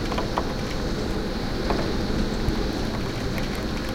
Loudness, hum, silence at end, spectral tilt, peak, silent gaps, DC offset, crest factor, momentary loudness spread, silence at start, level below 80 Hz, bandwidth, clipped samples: -27 LUFS; none; 0 s; -5.5 dB/octave; -8 dBFS; none; under 0.1%; 18 dB; 3 LU; 0 s; -30 dBFS; 16.5 kHz; under 0.1%